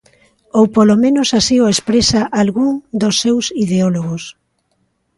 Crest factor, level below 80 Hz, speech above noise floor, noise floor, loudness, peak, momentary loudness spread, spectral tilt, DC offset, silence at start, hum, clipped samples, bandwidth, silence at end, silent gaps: 14 dB; -44 dBFS; 51 dB; -64 dBFS; -14 LUFS; 0 dBFS; 8 LU; -4.5 dB/octave; under 0.1%; 0.55 s; none; under 0.1%; 11.5 kHz; 0.85 s; none